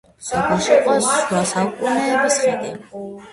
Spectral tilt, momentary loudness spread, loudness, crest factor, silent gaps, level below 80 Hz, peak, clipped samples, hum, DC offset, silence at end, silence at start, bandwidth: -3.5 dB/octave; 15 LU; -18 LUFS; 16 dB; none; -52 dBFS; -2 dBFS; under 0.1%; none; under 0.1%; 0 s; 0.2 s; 11.5 kHz